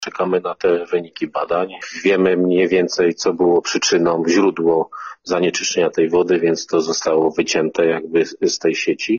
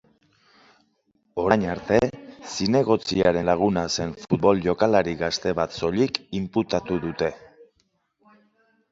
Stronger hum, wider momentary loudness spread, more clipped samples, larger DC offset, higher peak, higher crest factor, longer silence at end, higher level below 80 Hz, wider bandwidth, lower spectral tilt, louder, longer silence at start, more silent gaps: neither; about the same, 6 LU vs 8 LU; neither; neither; about the same, -2 dBFS vs 0 dBFS; second, 14 dB vs 24 dB; second, 0 s vs 1.3 s; second, -58 dBFS vs -50 dBFS; about the same, 7.2 kHz vs 7.8 kHz; second, -4 dB/octave vs -5.5 dB/octave; first, -17 LUFS vs -23 LUFS; second, 0 s vs 1.35 s; neither